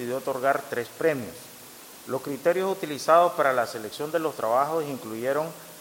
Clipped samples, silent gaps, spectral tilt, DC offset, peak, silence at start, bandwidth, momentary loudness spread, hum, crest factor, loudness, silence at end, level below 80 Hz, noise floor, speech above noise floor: under 0.1%; none; -4.5 dB/octave; under 0.1%; -6 dBFS; 0 s; 17 kHz; 17 LU; none; 20 dB; -26 LUFS; 0 s; -74 dBFS; -46 dBFS; 20 dB